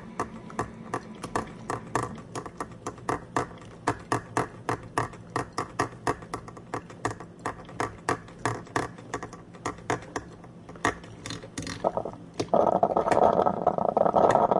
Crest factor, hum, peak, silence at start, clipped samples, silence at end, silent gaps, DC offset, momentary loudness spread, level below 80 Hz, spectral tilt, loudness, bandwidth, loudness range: 24 dB; none; -6 dBFS; 0 s; under 0.1%; 0 s; none; under 0.1%; 15 LU; -54 dBFS; -5.5 dB/octave; -30 LUFS; 11.5 kHz; 8 LU